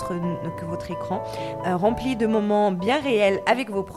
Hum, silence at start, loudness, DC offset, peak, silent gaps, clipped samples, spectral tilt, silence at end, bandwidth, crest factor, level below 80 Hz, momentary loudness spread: none; 0 s; -24 LUFS; 0.1%; -6 dBFS; none; under 0.1%; -6.5 dB/octave; 0 s; 14 kHz; 18 dB; -50 dBFS; 10 LU